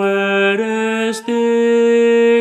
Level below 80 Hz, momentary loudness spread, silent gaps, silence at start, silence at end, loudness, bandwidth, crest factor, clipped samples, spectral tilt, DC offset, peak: -72 dBFS; 6 LU; none; 0 s; 0 s; -14 LUFS; 12 kHz; 10 dB; under 0.1%; -5 dB/octave; under 0.1%; -4 dBFS